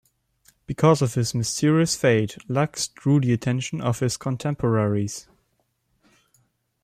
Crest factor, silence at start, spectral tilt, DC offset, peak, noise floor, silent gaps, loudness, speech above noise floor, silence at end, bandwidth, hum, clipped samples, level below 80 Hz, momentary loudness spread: 18 dB; 0.7 s; -5.5 dB/octave; under 0.1%; -6 dBFS; -71 dBFS; none; -23 LUFS; 49 dB; 1.6 s; 15 kHz; none; under 0.1%; -56 dBFS; 7 LU